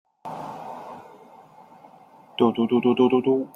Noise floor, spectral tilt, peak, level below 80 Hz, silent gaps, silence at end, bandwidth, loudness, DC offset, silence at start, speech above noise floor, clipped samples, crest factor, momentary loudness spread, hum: -50 dBFS; -8 dB/octave; -6 dBFS; -68 dBFS; none; 0.1 s; 6.2 kHz; -21 LUFS; under 0.1%; 0.25 s; 30 dB; under 0.1%; 20 dB; 20 LU; none